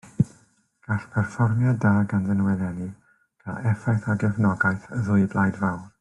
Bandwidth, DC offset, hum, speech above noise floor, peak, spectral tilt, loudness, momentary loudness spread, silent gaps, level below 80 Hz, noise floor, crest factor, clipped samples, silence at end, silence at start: 11 kHz; under 0.1%; none; 38 dB; -6 dBFS; -9 dB/octave; -24 LUFS; 9 LU; none; -56 dBFS; -61 dBFS; 18 dB; under 0.1%; 0.15 s; 0.05 s